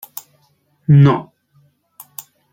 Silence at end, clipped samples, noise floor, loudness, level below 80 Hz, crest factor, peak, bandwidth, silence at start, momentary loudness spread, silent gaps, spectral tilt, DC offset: 1.3 s; under 0.1%; -60 dBFS; -13 LUFS; -54 dBFS; 16 dB; -2 dBFS; 17 kHz; 0.9 s; 24 LU; none; -8 dB/octave; under 0.1%